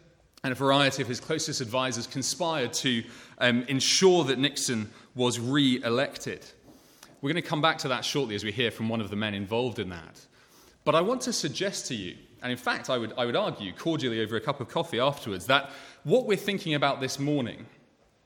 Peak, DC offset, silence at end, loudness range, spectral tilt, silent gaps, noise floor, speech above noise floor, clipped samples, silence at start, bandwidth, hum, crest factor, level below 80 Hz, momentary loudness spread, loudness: -4 dBFS; under 0.1%; 0.6 s; 5 LU; -4 dB/octave; none; -57 dBFS; 30 dB; under 0.1%; 0.45 s; 18 kHz; none; 24 dB; -68 dBFS; 11 LU; -27 LUFS